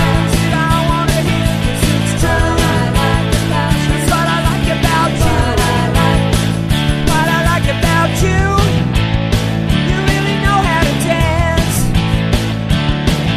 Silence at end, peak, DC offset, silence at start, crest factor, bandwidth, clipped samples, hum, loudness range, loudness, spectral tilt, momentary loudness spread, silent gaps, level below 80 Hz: 0 s; 0 dBFS; under 0.1%; 0 s; 12 dB; 14 kHz; under 0.1%; none; 1 LU; -14 LUFS; -5.5 dB/octave; 2 LU; none; -20 dBFS